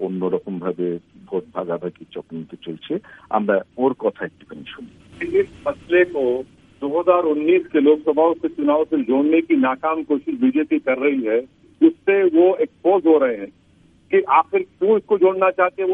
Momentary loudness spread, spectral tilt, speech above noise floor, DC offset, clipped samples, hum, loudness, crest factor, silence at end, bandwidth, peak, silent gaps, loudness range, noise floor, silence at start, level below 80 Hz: 16 LU; -8.5 dB/octave; 35 dB; under 0.1%; under 0.1%; none; -19 LUFS; 18 dB; 0 s; 3.8 kHz; -2 dBFS; none; 7 LU; -54 dBFS; 0 s; -60 dBFS